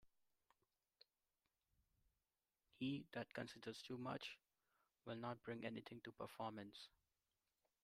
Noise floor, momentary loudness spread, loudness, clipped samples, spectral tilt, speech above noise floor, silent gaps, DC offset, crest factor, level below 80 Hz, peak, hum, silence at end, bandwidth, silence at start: under -90 dBFS; 10 LU; -52 LUFS; under 0.1%; -5.5 dB/octave; over 38 dB; none; under 0.1%; 20 dB; -86 dBFS; -36 dBFS; none; 0.95 s; 15.5 kHz; 0.05 s